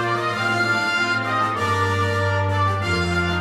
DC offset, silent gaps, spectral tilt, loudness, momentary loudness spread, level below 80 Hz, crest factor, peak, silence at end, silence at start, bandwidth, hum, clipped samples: under 0.1%; none; -5 dB/octave; -20 LUFS; 2 LU; -46 dBFS; 12 dB; -10 dBFS; 0 s; 0 s; 13.5 kHz; none; under 0.1%